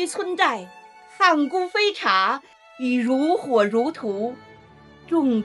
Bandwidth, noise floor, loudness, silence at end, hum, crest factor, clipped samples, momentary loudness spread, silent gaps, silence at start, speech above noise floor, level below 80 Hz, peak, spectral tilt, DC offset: 12 kHz; -48 dBFS; -22 LUFS; 0 s; none; 18 dB; under 0.1%; 11 LU; none; 0 s; 27 dB; -68 dBFS; -6 dBFS; -4 dB/octave; under 0.1%